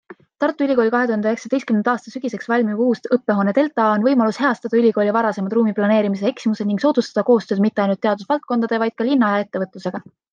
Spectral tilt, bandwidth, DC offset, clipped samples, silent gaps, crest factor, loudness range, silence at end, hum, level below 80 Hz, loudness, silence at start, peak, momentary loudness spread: -7 dB/octave; 7.4 kHz; under 0.1%; under 0.1%; none; 16 dB; 2 LU; 0.3 s; none; -70 dBFS; -19 LUFS; 0.1 s; -4 dBFS; 6 LU